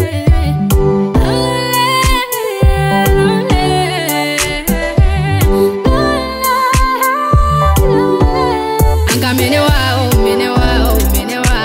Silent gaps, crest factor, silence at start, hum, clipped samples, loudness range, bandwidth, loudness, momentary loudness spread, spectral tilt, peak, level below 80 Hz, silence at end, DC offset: none; 10 dB; 0 s; none; under 0.1%; 1 LU; 16.5 kHz; -12 LUFS; 3 LU; -5 dB/octave; 0 dBFS; -16 dBFS; 0 s; under 0.1%